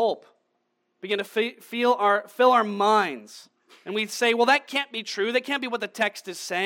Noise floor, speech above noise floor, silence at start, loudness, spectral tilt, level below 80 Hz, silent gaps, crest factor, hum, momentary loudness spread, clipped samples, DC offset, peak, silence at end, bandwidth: -74 dBFS; 50 dB; 0 s; -24 LUFS; -3 dB/octave; under -90 dBFS; none; 18 dB; none; 11 LU; under 0.1%; under 0.1%; -6 dBFS; 0 s; 17.5 kHz